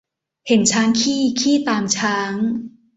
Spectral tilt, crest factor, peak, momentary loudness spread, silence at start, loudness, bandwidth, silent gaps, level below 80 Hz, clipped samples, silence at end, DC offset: -3 dB/octave; 16 dB; -2 dBFS; 7 LU; 0.45 s; -18 LUFS; 8.4 kHz; none; -60 dBFS; under 0.1%; 0.3 s; under 0.1%